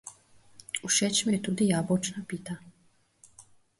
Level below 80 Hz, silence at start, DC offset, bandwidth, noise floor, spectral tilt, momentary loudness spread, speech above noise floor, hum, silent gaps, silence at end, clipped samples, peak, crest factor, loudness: -66 dBFS; 0.05 s; under 0.1%; 11.5 kHz; -66 dBFS; -3.5 dB/octave; 16 LU; 38 dB; none; none; 0.35 s; under 0.1%; -12 dBFS; 20 dB; -28 LUFS